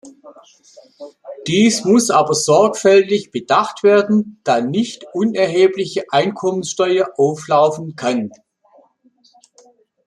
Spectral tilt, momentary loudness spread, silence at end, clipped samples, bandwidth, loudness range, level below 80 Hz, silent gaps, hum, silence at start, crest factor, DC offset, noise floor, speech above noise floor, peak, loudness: -4.5 dB/octave; 10 LU; 1.8 s; under 0.1%; 13 kHz; 5 LU; -64 dBFS; none; none; 0.05 s; 16 dB; under 0.1%; -56 dBFS; 40 dB; -2 dBFS; -16 LUFS